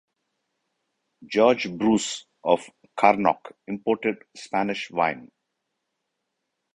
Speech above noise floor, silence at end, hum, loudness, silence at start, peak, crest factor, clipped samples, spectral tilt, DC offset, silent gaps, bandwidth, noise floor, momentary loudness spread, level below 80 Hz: 56 dB; 1.5 s; none; -24 LUFS; 1.2 s; -2 dBFS; 24 dB; under 0.1%; -4.5 dB/octave; under 0.1%; none; 10.5 kHz; -80 dBFS; 12 LU; -64 dBFS